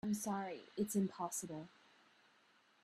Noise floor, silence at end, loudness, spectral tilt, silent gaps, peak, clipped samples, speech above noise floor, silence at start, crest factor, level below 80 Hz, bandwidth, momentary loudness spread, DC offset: -72 dBFS; 1.15 s; -42 LUFS; -5 dB/octave; none; -26 dBFS; under 0.1%; 30 dB; 0.05 s; 16 dB; -80 dBFS; 15 kHz; 12 LU; under 0.1%